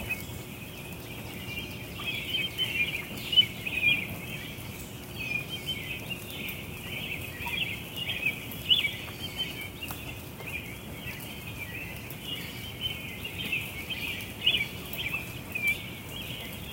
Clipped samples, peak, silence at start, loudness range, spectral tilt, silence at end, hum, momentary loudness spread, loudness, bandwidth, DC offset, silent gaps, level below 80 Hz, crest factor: under 0.1%; -10 dBFS; 0 s; 9 LU; -3 dB/octave; 0 s; none; 14 LU; -31 LUFS; 17 kHz; under 0.1%; none; -52 dBFS; 24 dB